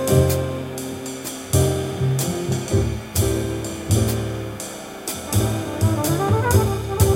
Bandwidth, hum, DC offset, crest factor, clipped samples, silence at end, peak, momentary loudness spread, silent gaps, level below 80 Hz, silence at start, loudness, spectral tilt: 16.5 kHz; none; under 0.1%; 18 dB; under 0.1%; 0 s; -2 dBFS; 11 LU; none; -34 dBFS; 0 s; -22 LUFS; -5.5 dB/octave